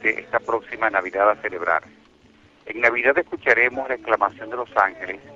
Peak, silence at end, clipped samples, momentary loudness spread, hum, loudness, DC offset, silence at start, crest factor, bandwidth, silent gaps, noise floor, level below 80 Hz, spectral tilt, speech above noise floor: -2 dBFS; 0 s; under 0.1%; 9 LU; none; -21 LUFS; under 0.1%; 0 s; 20 dB; 7.6 kHz; none; -54 dBFS; -60 dBFS; -5 dB/octave; 32 dB